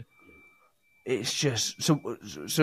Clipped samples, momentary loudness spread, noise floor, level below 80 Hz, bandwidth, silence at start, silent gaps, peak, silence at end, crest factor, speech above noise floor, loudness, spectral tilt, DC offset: under 0.1%; 12 LU; -66 dBFS; -66 dBFS; 15.5 kHz; 0 s; none; -8 dBFS; 0 s; 22 dB; 37 dB; -29 LUFS; -4 dB/octave; under 0.1%